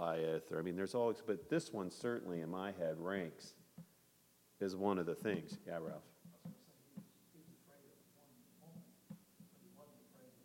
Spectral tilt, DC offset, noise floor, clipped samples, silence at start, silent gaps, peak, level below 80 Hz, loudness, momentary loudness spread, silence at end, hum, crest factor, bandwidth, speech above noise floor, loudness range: -6 dB/octave; under 0.1%; -72 dBFS; under 0.1%; 0 s; none; -24 dBFS; -82 dBFS; -42 LUFS; 25 LU; 0.15 s; none; 20 dB; 16.5 kHz; 30 dB; 20 LU